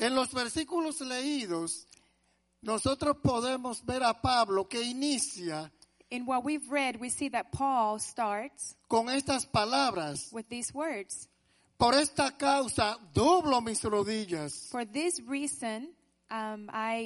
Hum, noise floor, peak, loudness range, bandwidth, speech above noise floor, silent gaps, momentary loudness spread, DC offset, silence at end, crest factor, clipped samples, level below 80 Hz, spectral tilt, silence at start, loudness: none; -73 dBFS; -10 dBFS; 4 LU; 11.5 kHz; 42 dB; none; 11 LU; under 0.1%; 0 s; 22 dB; under 0.1%; -58 dBFS; -3.5 dB/octave; 0 s; -31 LUFS